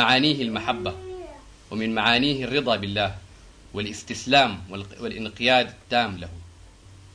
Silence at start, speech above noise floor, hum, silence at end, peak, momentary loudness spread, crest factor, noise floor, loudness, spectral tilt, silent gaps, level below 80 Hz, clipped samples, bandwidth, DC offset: 0 s; 24 dB; none; 0.05 s; -6 dBFS; 18 LU; 20 dB; -48 dBFS; -23 LUFS; -4.5 dB/octave; none; -50 dBFS; under 0.1%; 10.5 kHz; under 0.1%